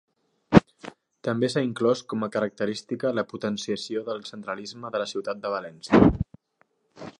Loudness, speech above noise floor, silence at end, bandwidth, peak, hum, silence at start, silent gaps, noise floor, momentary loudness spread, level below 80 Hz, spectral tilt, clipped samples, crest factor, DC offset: -26 LUFS; 42 dB; 0.1 s; 11.5 kHz; 0 dBFS; none; 0.5 s; none; -68 dBFS; 14 LU; -46 dBFS; -6.5 dB/octave; under 0.1%; 26 dB; under 0.1%